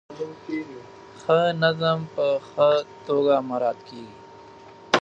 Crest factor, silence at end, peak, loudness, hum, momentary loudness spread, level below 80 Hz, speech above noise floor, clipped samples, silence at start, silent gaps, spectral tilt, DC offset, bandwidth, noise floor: 22 dB; 0.05 s; -2 dBFS; -23 LUFS; none; 20 LU; -68 dBFS; 22 dB; under 0.1%; 0.1 s; none; -5.5 dB/octave; under 0.1%; 8.2 kHz; -46 dBFS